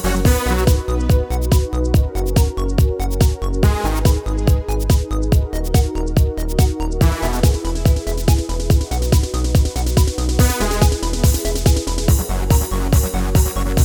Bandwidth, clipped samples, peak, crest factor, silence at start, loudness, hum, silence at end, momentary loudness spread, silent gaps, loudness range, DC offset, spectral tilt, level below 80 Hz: over 20 kHz; under 0.1%; -2 dBFS; 14 dB; 0 s; -18 LUFS; none; 0 s; 2 LU; none; 1 LU; under 0.1%; -5.5 dB/octave; -18 dBFS